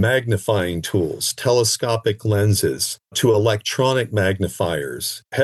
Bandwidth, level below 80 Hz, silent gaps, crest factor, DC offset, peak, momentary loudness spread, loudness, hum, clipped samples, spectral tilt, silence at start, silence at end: 13 kHz; -54 dBFS; none; 14 dB; under 0.1%; -6 dBFS; 6 LU; -20 LUFS; none; under 0.1%; -4.5 dB/octave; 0 s; 0 s